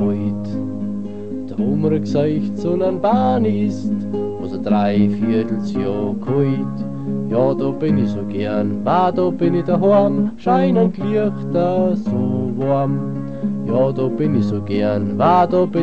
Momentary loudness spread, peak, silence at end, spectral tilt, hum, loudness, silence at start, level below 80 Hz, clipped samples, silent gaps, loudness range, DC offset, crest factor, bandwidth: 9 LU; -2 dBFS; 0 s; -9.5 dB/octave; none; -18 LUFS; 0 s; -50 dBFS; under 0.1%; none; 3 LU; 2%; 16 dB; 7.2 kHz